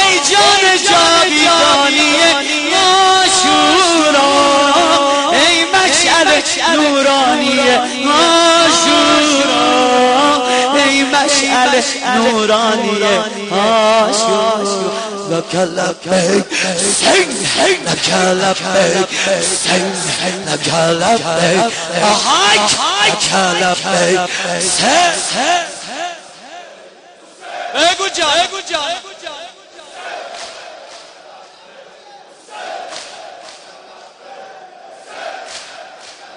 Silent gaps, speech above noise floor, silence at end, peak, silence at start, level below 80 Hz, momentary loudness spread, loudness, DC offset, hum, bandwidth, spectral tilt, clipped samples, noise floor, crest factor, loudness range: none; 27 dB; 0 s; 0 dBFS; 0 s; -50 dBFS; 18 LU; -11 LUFS; under 0.1%; none; 10.5 kHz; -2 dB/octave; under 0.1%; -41 dBFS; 14 dB; 21 LU